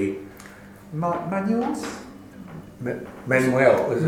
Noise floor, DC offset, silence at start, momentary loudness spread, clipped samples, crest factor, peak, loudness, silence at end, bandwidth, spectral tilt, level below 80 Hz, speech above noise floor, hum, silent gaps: -44 dBFS; under 0.1%; 0 s; 24 LU; under 0.1%; 20 dB; -4 dBFS; -23 LUFS; 0 s; 17 kHz; -6.5 dB/octave; -58 dBFS; 22 dB; none; none